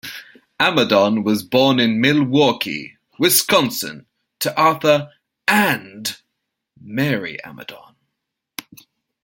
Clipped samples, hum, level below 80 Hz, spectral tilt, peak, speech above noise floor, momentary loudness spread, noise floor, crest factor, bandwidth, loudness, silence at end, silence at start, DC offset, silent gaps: under 0.1%; none; -62 dBFS; -4 dB/octave; 0 dBFS; 61 dB; 20 LU; -78 dBFS; 20 dB; 17 kHz; -17 LUFS; 1.45 s; 0.05 s; under 0.1%; none